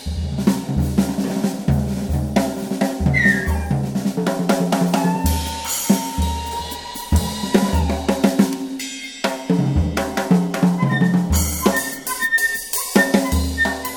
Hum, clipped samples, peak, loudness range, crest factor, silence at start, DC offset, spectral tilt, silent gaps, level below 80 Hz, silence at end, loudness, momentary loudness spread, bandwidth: none; under 0.1%; 0 dBFS; 2 LU; 18 dB; 0 s; under 0.1%; -5 dB/octave; none; -28 dBFS; 0 s; -19 LUFS; 7 LU; 19 kHz